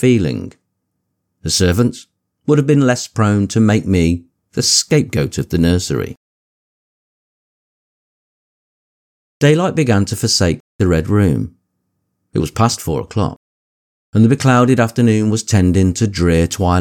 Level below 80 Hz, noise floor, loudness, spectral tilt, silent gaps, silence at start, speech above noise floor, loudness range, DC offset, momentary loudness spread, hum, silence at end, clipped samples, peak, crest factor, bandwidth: -36 dBFS; -72 dBFS; -15 LUFS; -5.5 dB/octave; 6.17-9.40 s, 10.60-10.79 s, 13.36-14.13 s; 0 s; 58 dB; 7 LU; under 0.1%; 9 LU; none; 0 s; under 0.1%; 0 dBFS; 14 dB; 18.5 kHz